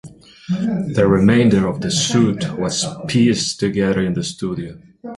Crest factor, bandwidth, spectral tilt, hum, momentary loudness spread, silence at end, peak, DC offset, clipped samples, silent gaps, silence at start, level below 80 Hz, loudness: 16 dB; 11.5 kHz; -5 dB/octave; none; 12 LU; 0 s; -2 dBFS; under 0.1%; under 0.1%; none; 0.05 s; -44 dBFS; -17 LUFS